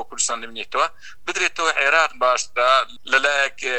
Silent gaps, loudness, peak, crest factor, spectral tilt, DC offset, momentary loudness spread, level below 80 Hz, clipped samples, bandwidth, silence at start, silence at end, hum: none; -19 LUFS; -2 dBFS; 18 dB; 1 dB/octave; 2%; 9 LU; -58 dBFS; under 0.1%; 15.5 kHz; 0 s; 0 s; none